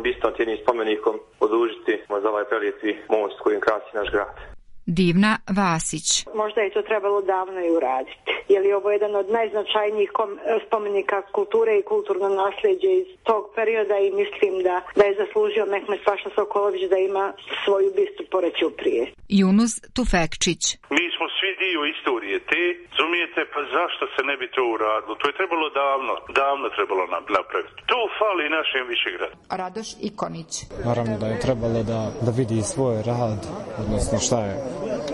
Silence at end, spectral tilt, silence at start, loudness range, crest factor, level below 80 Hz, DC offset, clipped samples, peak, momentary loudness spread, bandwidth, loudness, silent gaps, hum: 0 s; -4.5 dB/octave; 0 s; 3 LU; 16 dB; -44 dBFS; under 0.1%; under 0.1%; -6 dBFS; 6 LU; 11.5 kHz; -23 LUFS; none; none